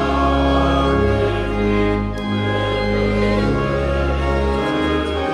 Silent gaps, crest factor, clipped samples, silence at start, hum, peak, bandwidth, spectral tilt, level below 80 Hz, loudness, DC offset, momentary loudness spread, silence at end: none; 14 dB; under 0.1%; 0 s; none; -4 dBFS; 11 kHz; -7 dB/octave; -24 dBFS; -18 LUFS; under 0.1%; 4 LU; 0 s